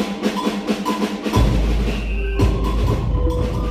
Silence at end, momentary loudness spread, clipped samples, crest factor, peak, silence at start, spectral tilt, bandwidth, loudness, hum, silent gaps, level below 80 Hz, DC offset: 0 s; 4 LU; under 0.1%; 14 dB; -6 dBFS; 0 s; -6.5 dB/octave; 14.5 kHz; -21 LUFS; none; none; -22 dBFS; under 0.1%